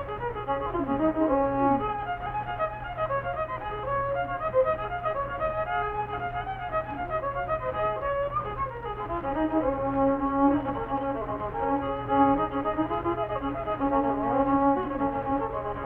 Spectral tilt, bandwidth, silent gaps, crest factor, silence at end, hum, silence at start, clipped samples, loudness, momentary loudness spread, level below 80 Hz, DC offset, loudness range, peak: -9.5 dB/octave; 4 kHz; none; 18 dB; 0 s; none; 0 s; under 0.1%; -28 LUFS; 8 LU; -44 dBFS; under 0.1%; 4 LU; -10 dBFS